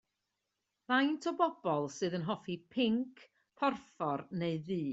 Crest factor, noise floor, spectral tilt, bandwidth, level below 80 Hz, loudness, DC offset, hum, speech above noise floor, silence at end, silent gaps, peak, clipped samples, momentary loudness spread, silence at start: 20 dB; -86 dBFS; -4 dB/octave; 8 kHz; -76 dBFS; -35 LUFS; under 0.1%; none; 52 dB; 0 s; none; -16 dBFS; under 0.1%; 7 LU; 0.9 s